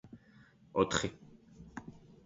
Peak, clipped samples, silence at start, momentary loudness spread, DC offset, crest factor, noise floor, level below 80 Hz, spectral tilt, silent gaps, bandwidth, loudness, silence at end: -14 dBFS; under 0.1%; 0.05 s; 26 LU; under 0.1%; 24 dB; -62 dBFS; -60 dBFS; -3.5 dB/octave; none; 7.6 kHz; -34 LUFS; 0.3 s